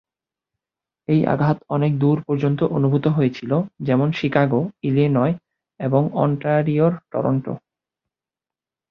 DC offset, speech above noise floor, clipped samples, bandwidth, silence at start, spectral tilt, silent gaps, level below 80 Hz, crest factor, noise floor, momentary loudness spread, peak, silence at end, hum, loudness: under 0.1%; 71 dB; under 0.1%; 6.2 kHz; 1.1 s; -10 dB/octave; none; -58 dBFS; 18 dB; -90 dBFS; 5 LU; -2 dBFS; 1.35 s; none; -20 LUFS